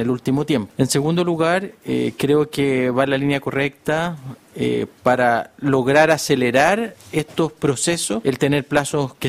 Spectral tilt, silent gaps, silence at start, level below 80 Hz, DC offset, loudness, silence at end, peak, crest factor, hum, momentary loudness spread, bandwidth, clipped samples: -5 dB/octave; none; 0 s; -52 dBFS; under 0.1%; -19 LUFS; 0 s; -2 dBFS; 18 dB; none; 7 LU; 16 kHz; under 0.1%